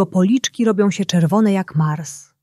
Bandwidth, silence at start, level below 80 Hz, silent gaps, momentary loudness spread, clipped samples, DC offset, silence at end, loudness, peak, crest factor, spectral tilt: 13 kHz; 0 s; -62 dBFS; none; 6 LU; under 0.1%; under 0.1%; 0.2 s; -17 LUFS; -4 dBFS; 12 dB; -6 dB/octave